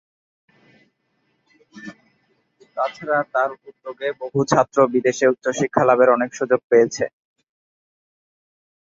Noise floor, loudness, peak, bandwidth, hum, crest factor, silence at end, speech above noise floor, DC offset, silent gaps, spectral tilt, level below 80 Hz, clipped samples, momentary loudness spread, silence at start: -69 dBFS; -19 LUFS; 0 dBFS; 7.8 kHz; none; 22 dB; 1.75 s; 50 dB; under 0.1%; 6.64-6.70 s; -5 dB/octave; -64 dBFS; under 0.1%; 21 LU; 1.75 s